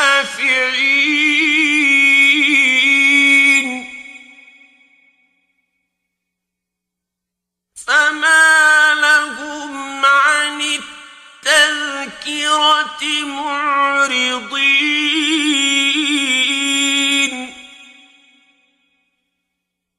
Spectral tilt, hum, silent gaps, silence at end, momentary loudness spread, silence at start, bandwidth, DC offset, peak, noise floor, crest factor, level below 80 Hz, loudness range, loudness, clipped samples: 1 dB/octave; none; none; 2.35 s; 14 LU; 0 s; 16 kHz; under 0.1%; 0 dBFS; -81 dBFS; 16 dB; -62 dBFS; 7 LU; -12 LUFS; under 0.1%